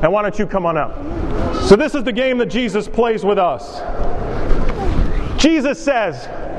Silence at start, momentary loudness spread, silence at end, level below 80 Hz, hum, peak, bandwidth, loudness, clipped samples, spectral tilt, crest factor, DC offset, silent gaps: 0 s; 12 LU; 0 s; -24 dBFS; none; 0 dBFS; 10 kHz; -18 LUFS; under 0.1%; -5.5 dB/octave; 16 dB; under 0.1%; none